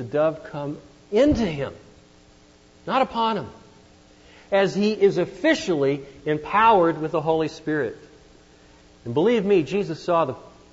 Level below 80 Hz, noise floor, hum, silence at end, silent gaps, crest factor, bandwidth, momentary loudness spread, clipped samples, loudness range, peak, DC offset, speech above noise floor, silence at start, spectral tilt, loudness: -50 dBFS; -53 dBFS; none; 0.25 s; none; 18 dB; 8 kHz; 13 LU; under 0.1%; 5 LU; -6 dBFS; under 0.1%; 31 dB; 0 s; -6 dB/octave; -22 LUFS